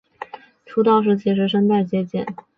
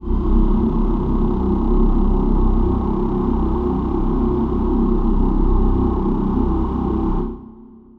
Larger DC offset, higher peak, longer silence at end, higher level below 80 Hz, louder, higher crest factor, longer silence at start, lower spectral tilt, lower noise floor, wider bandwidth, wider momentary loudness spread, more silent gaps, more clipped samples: neither; about the same, -6 dBFS vs -4 dBFS; about the same, 0.25 s vs 0.35 s; second, -62 dBFS vs -20 dBFS; about the same, -19 LUFS vs -20 LUFS; about the same, 14 dB vs 14 dB; first, 0.2 s vs 0 s; second, -9 dB/octave vs -11.5 dB/octave; about the same, -42 dBFS vs -41 dBFS; first, 5 kHz vs 3.8 kHz; first, 20 LU vs 2 LU; neither; neither